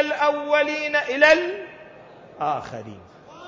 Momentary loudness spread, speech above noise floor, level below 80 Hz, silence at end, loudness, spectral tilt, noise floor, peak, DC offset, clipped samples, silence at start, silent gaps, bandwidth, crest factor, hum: 21 LU; 24 dB; -60 dBFS; 0 s; -20 LUFS; -3.5 dB/octave; -45 dBFS; -4 dBFS; under 0.1%; under 0.1%; 0 s; none; 7.6 kHz; 20 dB; none